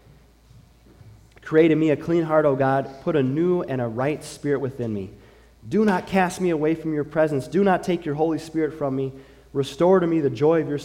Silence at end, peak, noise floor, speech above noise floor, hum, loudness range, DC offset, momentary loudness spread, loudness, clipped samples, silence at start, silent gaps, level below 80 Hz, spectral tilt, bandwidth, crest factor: 0 s; -6 dBFS; -52 dBFS; 31 dB; none; 3 LU; under 0.1%; 10 LU; -22 LUFS; under 0.1%; 1.05 s; none; -54 dBFS; -7 dB/octave; 15 kHz; 16 dB